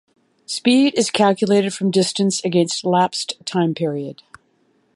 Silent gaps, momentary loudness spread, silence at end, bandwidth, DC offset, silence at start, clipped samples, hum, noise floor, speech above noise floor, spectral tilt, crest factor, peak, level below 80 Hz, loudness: none; 9 LU; 0.85 s; 11.5 kHz; under 0.1%; 0.5 s; under 0.1%; none; -62 dBFS; 44 dB; -4.5 dB/octave; 18 dB; -2 dBFS; -68 dBFS; -18 LUFS